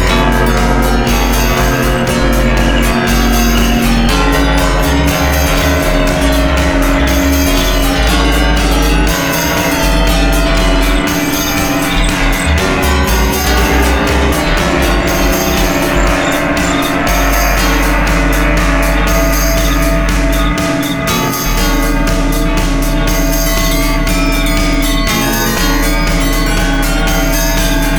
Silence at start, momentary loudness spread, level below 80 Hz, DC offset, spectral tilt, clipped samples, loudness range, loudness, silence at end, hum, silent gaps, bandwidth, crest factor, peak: 0 s; 2 LU; -14 dBFS; 0.7%; -4.5 dB/octave; under 0.1%; 2 LU; -12 LUFS; 0 s; none; none; over 20 kHz; 10 dB; 0 dBFS